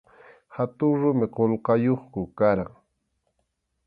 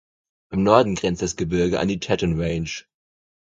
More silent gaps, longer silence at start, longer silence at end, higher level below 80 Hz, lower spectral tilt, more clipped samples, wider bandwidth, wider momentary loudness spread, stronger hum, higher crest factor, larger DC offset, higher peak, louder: neither; about the same, 0.5 s vs 0.5 s; first, 1.2 s vs 0.65 s; second, -56 dBFS vs -42 dBFS; first, -12 dB/octave vs -5.5 dB/octave; neither; second, 5 kHz vs 9.2 kHz; about the same, 11 LU vs 12 LU; neither; about the same, 18 dB vs 22 dB; neither; second, -8 dBFS vs 0 dBFS; about the same, -24 LUFS vs -22 LUFS